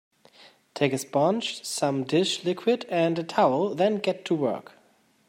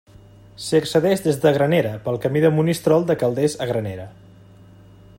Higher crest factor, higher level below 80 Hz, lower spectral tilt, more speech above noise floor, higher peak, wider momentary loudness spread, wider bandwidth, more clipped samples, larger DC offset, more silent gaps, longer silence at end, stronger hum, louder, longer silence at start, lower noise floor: about the same, 18 dB vs 18 dB; second, -74 dBFS vs -54 dBFS; about the same, -5 dB/octave vs -6 dB/octave; first, 38 dB vs 27 dB; second, -8 dBFS vs -2 dBFS; second, 6 LU vs 10 LU; about the same, 16 kHz vs 16.5 kHz; neither; neither; neither; second, 0.65 s vs 1.05 s; neither; second, -25 LUFS vs -19 LUFS; first, 0.75 s vs 0.6 s; first, -63 dBFS vs -46 dBFS